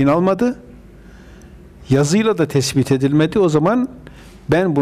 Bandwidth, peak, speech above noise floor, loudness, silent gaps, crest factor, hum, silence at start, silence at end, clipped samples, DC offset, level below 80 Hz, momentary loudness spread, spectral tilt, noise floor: 15.5 kHz; -6 dBFS; 26 dB; -16 LUFS; none; 12 dB; none; 0 s; 0 s; under 0.1%; under 0.1%; -44 dBFS; 6 LU; -6 dB/octave; -41 dBFS